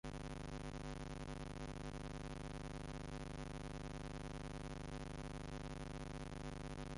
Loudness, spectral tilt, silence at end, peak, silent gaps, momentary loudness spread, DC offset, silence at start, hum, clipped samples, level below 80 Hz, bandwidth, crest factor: -50 LUFS; -5.5 dB/octave; 0 s; -36 dBFS; none; 0 LU; under 0.1%; 0.05 s; none; under 0.1%; -54 dBFS; 11.5 kHz; 12 dB